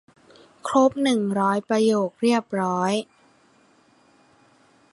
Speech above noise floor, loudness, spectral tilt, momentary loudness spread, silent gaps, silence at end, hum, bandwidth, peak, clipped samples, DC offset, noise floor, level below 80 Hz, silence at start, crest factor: 37 dB; -22 LUFS; -5.5 dB/octave; 6 LU; none; 1.9 s; none; 11.5 kHz; -6 dBFS; under 0.1%; under 0.1%; -58 dBFS; -70 dBFS; 0.65 s; 18 dB